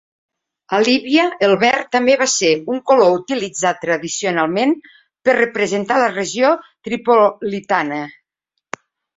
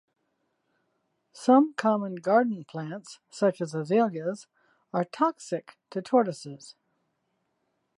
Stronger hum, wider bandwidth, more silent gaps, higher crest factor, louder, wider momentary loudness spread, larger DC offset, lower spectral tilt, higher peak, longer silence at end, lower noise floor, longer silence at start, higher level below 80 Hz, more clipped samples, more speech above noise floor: neither; second, 8 kHz vs 11.5 kHz; neither; about the same, 16 dB vs 20 dB; first, -16 LUFS vs -27 LUFS; second, 11 LU vs 18 LU; neither; second, -3.5 dB/octave vs -6.5 dB/octave; first, 0 dBFS vs -10 dBFS; second, 1.05 s vs 1.25 s; about the same, -77 dBFS vs -77 dBFS; second, 0.7 s vs 1.35 s; first, -62 dBFS vs -84 dBFS; neither; first, 61 dB vs 50 dB